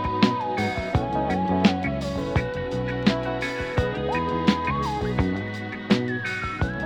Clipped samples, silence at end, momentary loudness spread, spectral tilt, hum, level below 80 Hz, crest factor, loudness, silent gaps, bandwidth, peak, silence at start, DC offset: under 0.1%; 0 s; 6 LU; -6.5 dB/octave; none; -38 dBFS; 20 dB; -25 LUFS; none; 16.5 kHz; -4 dBFS; 0 s; under 0.1%